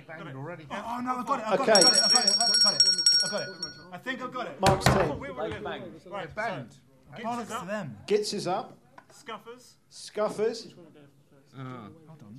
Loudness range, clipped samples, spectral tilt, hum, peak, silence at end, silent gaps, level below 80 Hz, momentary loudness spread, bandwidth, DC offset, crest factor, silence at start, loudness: 15 LU; under 0.1%; -2.5 dB/octave; none; -4 dBFS; 0 s; none; -54 dBFS; 23 LU; 15.5 kHz; under 0.1%; 24 dB; 0.1 s; -24 LUFS